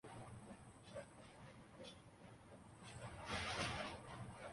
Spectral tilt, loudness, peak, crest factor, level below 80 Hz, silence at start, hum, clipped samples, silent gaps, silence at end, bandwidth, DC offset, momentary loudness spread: -4 dB/octave; -51 LUFS; -30 dBFS; 22 dB; -66 dBFS; 0.05 s; none; under 0.1%; none; 0 s; 11.5 kHz; under 0.1%; 18 LU